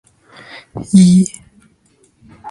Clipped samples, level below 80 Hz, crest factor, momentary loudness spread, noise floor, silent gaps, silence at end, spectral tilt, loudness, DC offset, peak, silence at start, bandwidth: under 0.1%; -50 dBFS; 16 dB; 27 LU; -55 dBFS; none; 0 s; -6.5 dB/octave; -11 LUFS; under 0.1%; 0 dBFS; 0.75 s; 11.5 kHz